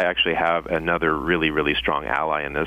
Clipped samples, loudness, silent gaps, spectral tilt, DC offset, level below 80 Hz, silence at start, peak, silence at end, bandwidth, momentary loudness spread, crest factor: under 0.1%; -21 LUFS; none; -6.5 dB/octave; under 0.1%; -42 dBFS; 0 s; -6 dBFS; 0 s; 15.5 kHz; 3 LU; 16 dB